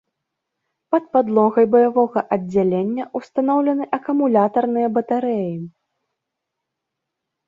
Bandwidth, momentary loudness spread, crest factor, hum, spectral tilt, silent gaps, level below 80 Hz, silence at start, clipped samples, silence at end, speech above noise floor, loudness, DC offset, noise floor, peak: 7.2 kHz; 9 LU; 18 dB; none; -9.5 dB/octave; none; -64 dBFS; 0.9 s; under 0.1%; 1.8 s; 63 dB; -19 LUFS; under 0.1%; -81 dBFS; -2 dBFS